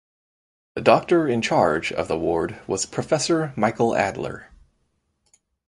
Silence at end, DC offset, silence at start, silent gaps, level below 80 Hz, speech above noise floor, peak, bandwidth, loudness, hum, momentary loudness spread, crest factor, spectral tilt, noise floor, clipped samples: 1.25 s; under 0.1%; 0.75 s; none; -52 dBFS; 49 dB; 0 dBFS; 11.5 kHz; -22 LUFS; none; 9 LU; 22 dB; -4.5 dB/octave; -71 dBFS; under 0.1%